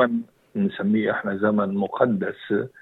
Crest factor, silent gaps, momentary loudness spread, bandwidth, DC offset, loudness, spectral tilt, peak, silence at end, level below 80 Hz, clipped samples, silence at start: 20 dB; none; 5 LU; 4.1 kHz; under 0.1%; -24 LUFS; -9.5 dB/octave; -4 dBFS; 0.15 s; -68 dBFS; under 0.1%; 0 s